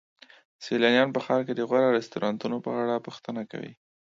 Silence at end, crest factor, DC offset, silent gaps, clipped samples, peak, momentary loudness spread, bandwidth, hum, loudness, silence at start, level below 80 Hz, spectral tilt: 0.4 s; 20 dB; under 0.1%; none; under 0.1%; -8 dBFS; 16 LU; 7.6 kHz; none; -26 LUFS; 0.6 s; -74 dBFS; -5.5 dB/octave